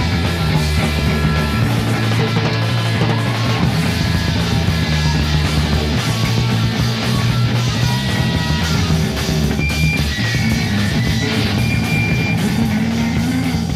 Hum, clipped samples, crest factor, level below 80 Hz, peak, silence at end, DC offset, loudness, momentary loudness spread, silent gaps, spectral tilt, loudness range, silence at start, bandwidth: none; under 0.1%; 12 dB; -26 dBFS; -4 dBFS; 0 s; under 0.1%; -17 LUFS; 1 LU; none; -5.5 dB/octave; 0 LU; 0 s; 15.5 kHz